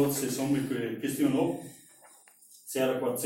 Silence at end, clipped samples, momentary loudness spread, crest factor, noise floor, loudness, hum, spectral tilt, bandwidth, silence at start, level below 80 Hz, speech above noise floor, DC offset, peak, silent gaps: 0 s; under 0.1%; 12 LU; 16 dB; -57 dBFS; -30 LUFS; none; -5 dB/octave; 16.5 kHz; 0 s; -66 dBFS; 28 dB; under 0.1%; -16 dBFS; none